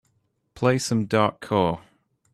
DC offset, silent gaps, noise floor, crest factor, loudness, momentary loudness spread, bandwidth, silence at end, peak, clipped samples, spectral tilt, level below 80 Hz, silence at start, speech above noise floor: under 0.1%; none; -70 dBFS; 18 dB; -23 LUFS; 4 LU; 13.5 kHz; 0.55 s; -6 dBFS; under 0.1%; -5.5 dB/octave; -58 dBFS; 0.55 s; 48 dB